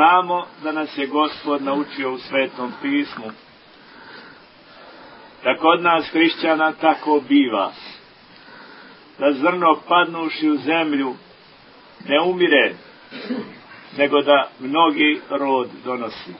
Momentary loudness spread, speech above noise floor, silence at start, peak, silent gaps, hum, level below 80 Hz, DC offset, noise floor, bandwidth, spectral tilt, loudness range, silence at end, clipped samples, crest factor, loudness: 19 LU; 28 dB; 0 s; 0 dBFS; none; none; -68 dBFS; under 0.1%; -47 dBFS; 5.8 kHz; -9 dB/octave; 7 LU; 0 s; under 0.1%; 20 dB; -19 LUFS